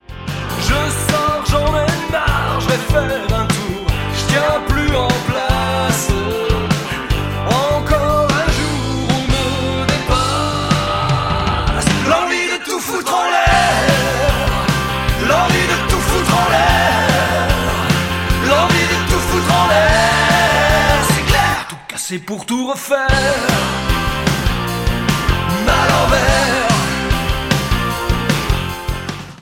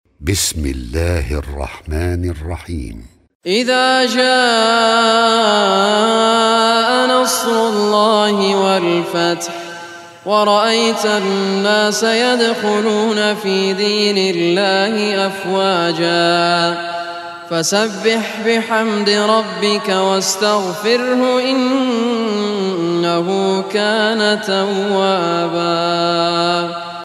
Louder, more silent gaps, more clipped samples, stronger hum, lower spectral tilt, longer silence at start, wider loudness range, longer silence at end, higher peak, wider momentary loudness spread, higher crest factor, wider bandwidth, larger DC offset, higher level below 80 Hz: about the same, -15 LUFS vs -15 LUFS; second, none vs 3.35-3.40 s; neither; neither; about the same, -4.5 dB/octave vs -3.5 dB/octave; about the same, 0.1 s vs 0.2 s; about the same, 4 LU vs 4 LU; about the same, 0.05 s vs 0 s; about the same, -2 dBFS vs 0 dBFS; second, 7 LU vs 10 LU; about the same, 14 dB vs 14 dB; about the same, 16.5 kHz vs 16 kHz; first, 0.3% vs under 0.1%; first, -24 dBFS vs -36 dBFS